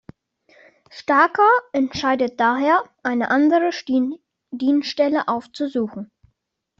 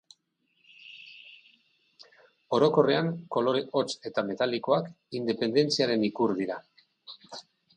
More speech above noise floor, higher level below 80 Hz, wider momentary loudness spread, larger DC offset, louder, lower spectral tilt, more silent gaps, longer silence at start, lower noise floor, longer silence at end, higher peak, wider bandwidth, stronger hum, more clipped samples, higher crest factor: first, 52 dB vs 46 dB; first, -62 dBFS vs -74 dBFS; second, 12 LU vs 22 LU; neither; first, -19 LUFS vs -27 LUFS; about the same, -5 dB/octave vs -5.5 dB/octave; neither; about the same, 0.95 s vs 0.85 s; about the same, -71 dBFS vs -74 dBFS; first, 0.75 s vs 0.35 s; first, -2 dBFS vs -10 dBFS; second, 7.4 kHz vs 9.8 kHz; neither; neither; about the same, 18 dB vs 20 dB